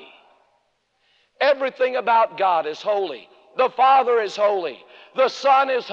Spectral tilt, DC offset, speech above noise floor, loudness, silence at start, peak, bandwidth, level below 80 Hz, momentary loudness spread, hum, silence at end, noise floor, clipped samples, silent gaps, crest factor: -3 dB/octave; under 0.1%; 48 dB; -20 LUFS; 1.4 s; -6 dBFS; 7.6 kHz; -84 dBFS; 13 LU; none; 0 s; -68 dBFS; under 0.1%; none; 16 dB